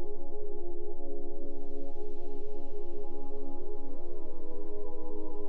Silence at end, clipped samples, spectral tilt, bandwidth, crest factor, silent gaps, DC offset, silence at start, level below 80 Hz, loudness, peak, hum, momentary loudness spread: 0 s; under 0.1%; -10.5 dB/octave; 1.1 kHz; 4 dB; none; under 0.1%; 0 s; -36 dBFS; -44 LUFS; -18 dBFS; none; 2 LU